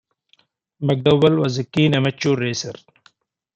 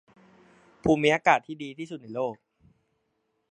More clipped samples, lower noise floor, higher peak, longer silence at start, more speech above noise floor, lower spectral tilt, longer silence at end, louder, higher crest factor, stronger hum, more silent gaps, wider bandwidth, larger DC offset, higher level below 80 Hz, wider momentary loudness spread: neither; second, -61 dBFS vs -76 dBFS; about the same, -2 dBFS vs -4 dBFS; about the same, 0.8 s vs 0.85 s; second, 43 dB vs 50 dB; about the same, -6 dB/octave vs -5.5 dB/octave; second, 0.85 s vs 1.15 s; first, -19 LUFS vs -26 LUFS; second, 18 dB vs 24 dB; neither; neither; second, 8.2 kHz vs 10 kHz; neither; about the same, -58 dBFS vs -56 dBFS; second, 11 LU vs 16 LU